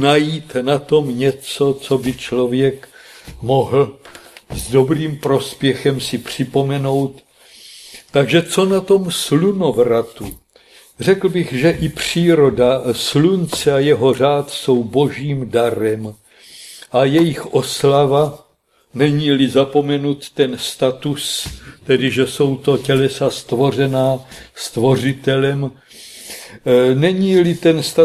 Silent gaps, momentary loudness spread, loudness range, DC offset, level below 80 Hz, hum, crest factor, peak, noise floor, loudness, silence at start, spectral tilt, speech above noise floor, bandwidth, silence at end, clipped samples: none; 12 LU; 4 LU; under 0.1%; -46 dBFS; none; 16 dB; 0 dBFS; -58 dBFS; -16 LUFS; 0 s; -5.5 dB/octave; 42 dB; 14.5 kHz; 0 s; under 0.1%